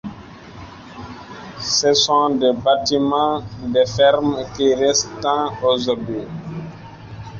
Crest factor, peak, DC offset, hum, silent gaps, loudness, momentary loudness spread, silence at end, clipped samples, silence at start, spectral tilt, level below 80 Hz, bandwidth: 18 dB; -2 dBFS; under 0.1%; none; none; -18 LUFS; 22 LU; 0 s; under 0.1%; 0.05 s; -3.5 dB/octave; -48 dBFS; 7.6 kHz